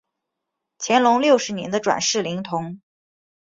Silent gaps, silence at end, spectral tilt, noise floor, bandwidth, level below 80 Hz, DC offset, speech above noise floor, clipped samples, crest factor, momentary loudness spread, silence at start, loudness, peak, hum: none; 0.7 s; -3.5 dB/octave; -81 dBFS; 7.8 kHz; -64 dBFS; under 0.1%; 61 dB; under 0.1%; 18 dB; 12 LU; 0.8 s; -20 LUFS; -4 dBFS; none